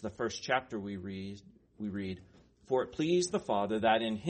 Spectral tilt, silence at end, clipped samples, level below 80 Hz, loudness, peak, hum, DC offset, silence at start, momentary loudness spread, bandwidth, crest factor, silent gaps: -4.5 dB/octave; 0 s; under 0.1%; -66 dBFS; -34 LUFS; -14 dBFS; none; under 0.1%; 0 s; 14 LU; 8.4 kHz; 20 dB; none